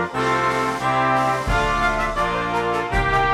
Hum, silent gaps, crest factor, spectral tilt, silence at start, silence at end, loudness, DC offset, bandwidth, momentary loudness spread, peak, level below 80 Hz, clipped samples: none; none; 14 dB; -5 dB/octave; 0 s; 0 s; -20 LUFS; under 0.1%; 15.5 kHz; 3 LU; -6 dBFS; -32 dBFS; under 0.1%